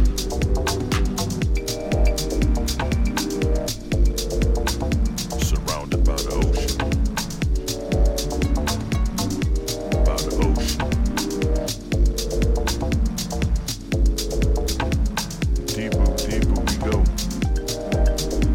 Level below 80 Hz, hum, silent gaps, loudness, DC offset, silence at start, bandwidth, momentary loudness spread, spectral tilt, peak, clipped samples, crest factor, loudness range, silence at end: -22 dBFS; none; none; -23 LUFS; under 0.1%; 0 s; 17 kHz; 3 LU; -5 dB/octave; -6 dBFS; under 0.1%; 14 dB; 1 LU; 0 s